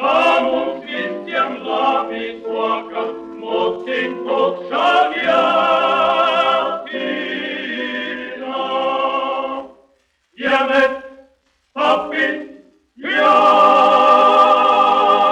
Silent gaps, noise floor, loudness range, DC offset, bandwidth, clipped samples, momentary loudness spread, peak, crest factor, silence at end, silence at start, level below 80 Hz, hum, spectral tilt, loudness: none; -60 dBFS; 8 LU; under 0.1%; 9.8 kHz; under 0.1%; 14 LU; 0 dBFS; 16 dB; 0 s; 0 s; -60 dBFS; none; -4 dB/octave; -16 LUFS